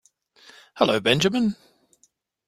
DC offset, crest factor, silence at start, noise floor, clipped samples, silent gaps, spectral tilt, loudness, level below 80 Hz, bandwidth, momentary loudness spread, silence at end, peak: under 0.1%; 24 dB; 0.75 s; -66 dBFS; under 0.1%; none; -4.5 dB/octave; -21 LUFS; -60 dBFS; 15.5 kHz; 7 LU; 0.95 s; -2 dBFS